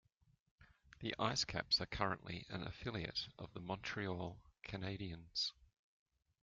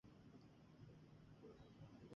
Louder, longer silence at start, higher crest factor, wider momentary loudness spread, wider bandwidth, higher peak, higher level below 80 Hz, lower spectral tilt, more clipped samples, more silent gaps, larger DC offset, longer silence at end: first, -42 LUFS vs -65 LUFS; first, 0.6 s vs 0.05 s; first, 24 dB vs 16 dB; first, 12 LU vs 3 LU; about the same, 7.4 kHz vs 7 kHz; first, -22 dBFS vs -48 dBFS; first, -64 dBFS vs -78 dBFS; second, -2.5 dB/octave vs -7 dB/octave; neither; neither; neither; first, 0.75 s vs 0 s